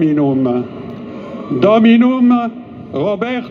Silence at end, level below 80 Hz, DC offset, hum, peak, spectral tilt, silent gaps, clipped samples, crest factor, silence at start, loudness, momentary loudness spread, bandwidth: 0 s; -56 dBFS; under 0.1%; none; 0 dBFS; -8.5 dB/octave; none; under 0.1%; 14 dB; 0 s; -13 LUFS; 19 LU; 5 kHz